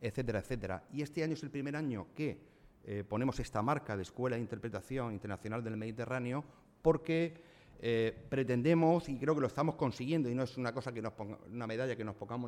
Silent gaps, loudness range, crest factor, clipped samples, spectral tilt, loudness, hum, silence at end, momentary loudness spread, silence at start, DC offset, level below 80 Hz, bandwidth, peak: none; 5 LU; 20 dB; under 0.1%; -7.5 dB/octave; -37 LUFS; none; 0 s; 10 LU; 0 s; under 0.1%; -58 dBFS; 13.5 kHz; -16 dBFS